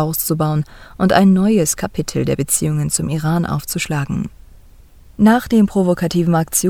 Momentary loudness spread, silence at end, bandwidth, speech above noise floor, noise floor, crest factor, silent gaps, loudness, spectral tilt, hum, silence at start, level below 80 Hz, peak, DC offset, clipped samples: 9 LU; 0 s; 19 kHz; 27 dB; -43 dBFS; 16 dB; none; -16 LUFS; -5.5 dB/octave; none; 0 s; -40 dBFS; 0 dBFS; under 0.1%; under 0.1%